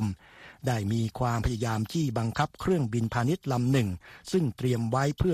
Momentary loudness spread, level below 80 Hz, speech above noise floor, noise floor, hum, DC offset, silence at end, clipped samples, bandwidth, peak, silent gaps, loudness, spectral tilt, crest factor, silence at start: 5 LU; -46 dBFS; 24 dB; -51 dBFS; none; under 0.1%; 0 s; under 0.1%; 14.5 kHz; -10 dBFS; none; -29 LUFS; -6.5 dB/octave; 18 dB; 0 s